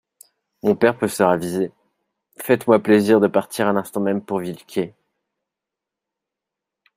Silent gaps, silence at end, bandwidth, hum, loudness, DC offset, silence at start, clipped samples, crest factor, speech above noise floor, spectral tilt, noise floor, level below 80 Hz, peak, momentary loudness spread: none; 2.1 s; 16 kHz; none; -19 LUFS; under 0.1%; 0.65 s; under 0.1%; 20 dB; 66 dB; -6 dB/octave; -85 dBFS; -64 dBFS; -2 dBFS; 12 LU